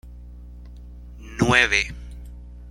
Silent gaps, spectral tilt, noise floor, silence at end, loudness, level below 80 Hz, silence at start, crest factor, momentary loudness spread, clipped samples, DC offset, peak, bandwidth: none; -4 dB/octave; -40 dBFS; 0 s; -19 LUFS; -38 dBFS; 0.05 s; 24 dB; 26 LU; under 0.1%; under 0.1%; 0 dBFS; 16 kHz